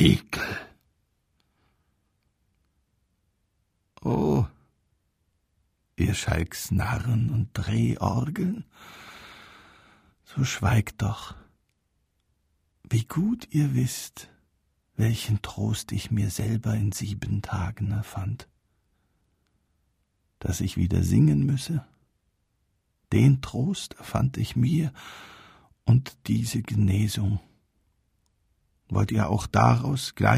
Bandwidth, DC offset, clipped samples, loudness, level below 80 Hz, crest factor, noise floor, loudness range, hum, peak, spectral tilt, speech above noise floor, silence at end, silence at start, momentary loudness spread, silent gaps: 15.5 kHz; under 0.1%; under 0.1%; -26 LUFS; -46 dBFS; 22 dB; -73 dBFS; 6 LU; none; -4 dBFS; -6 dB/octave; 49 dB; 0 s; 0 s; 15 LU; none